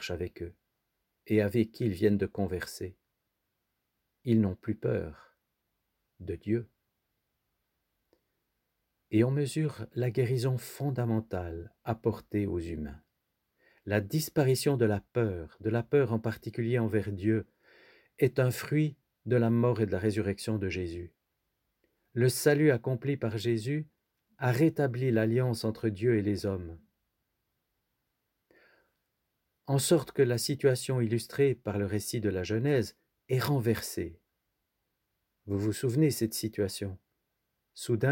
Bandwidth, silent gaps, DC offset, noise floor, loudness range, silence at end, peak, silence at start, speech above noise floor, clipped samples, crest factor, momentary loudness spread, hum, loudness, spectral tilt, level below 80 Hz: 17 kHz; none; under 0.1%; -82 dBFS; 6 LU; 0 s; -12 dBFS; 0 s; 53 dB; under 0.1%; 20 dB; 13 LU; none; -30 LUFS; -6.5 dB/octave; -60 dBFS